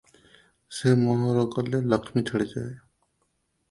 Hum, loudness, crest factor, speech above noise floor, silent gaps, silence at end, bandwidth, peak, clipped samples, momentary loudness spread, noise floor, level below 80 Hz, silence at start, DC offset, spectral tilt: none; -25 LUFS; 20 dB; 49 dB; none; 0.9 s; 11.5 kHz; -8 dBFS; under 0.1%; 13 LU; -73 dBFS; -60 dBFS; 0.7 s; under 0.1%; -7 dB/octave